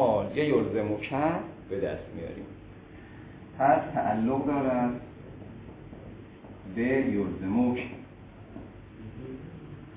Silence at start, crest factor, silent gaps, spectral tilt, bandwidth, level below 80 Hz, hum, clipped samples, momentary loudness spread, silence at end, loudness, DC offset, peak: 0 s; 20 dB; none; -6.5 dB/octave; 4 kHz; -54 dBFS; none; under 0.1%; 21 LU; 0 s; -29 LUFS; under 0.1%; -10 dBFS